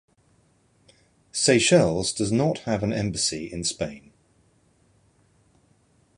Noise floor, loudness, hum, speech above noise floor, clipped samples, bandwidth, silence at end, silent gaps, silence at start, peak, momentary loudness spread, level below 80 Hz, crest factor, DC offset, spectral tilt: -63 dBFS; -23 LUFS; none; 40 dB; under 0.1%; 11.5 kHz; 2.2 s; none; 1.35 s; -4 dBFS; 11 LU; -52 dBFS; 22 dB; under 0.1%; -4 dB/octave